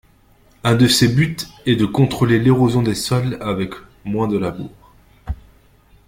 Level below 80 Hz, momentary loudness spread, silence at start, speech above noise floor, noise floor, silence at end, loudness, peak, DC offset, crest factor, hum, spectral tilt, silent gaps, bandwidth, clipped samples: -42 dBFS; 19 LU; 0.65 s; 36 dB; -52 dBFS; 0.75 s; -17 LUFS; -2 dBFS; under 0.1%; 16 dB; none; -5.5 dB/octave; none; 16.5 kHz; under 0.1%